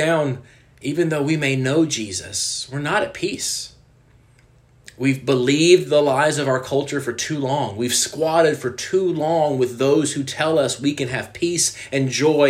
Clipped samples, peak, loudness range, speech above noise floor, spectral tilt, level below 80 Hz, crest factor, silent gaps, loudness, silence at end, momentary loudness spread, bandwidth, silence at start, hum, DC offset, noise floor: under 0.1%; -2 dBFS; 5 LU; 33 dB; -4 dB/octave; -58 dBFS; 18 dB; none; -20 LUFS; 0 s; 8 LU; 15.5 kHz; 0 s; none; under 0.1%; -53 dBFS